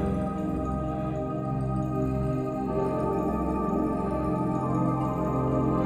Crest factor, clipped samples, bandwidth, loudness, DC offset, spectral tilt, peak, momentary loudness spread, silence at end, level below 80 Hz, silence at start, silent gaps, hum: 12 dB; under 0.1%; 13.5 kHz; -28 LUFS; under 0.1%; -9.5 dB/octave; -14 dBFS; 4 LU; 0 s; -40 dBFS; 0 s; none; none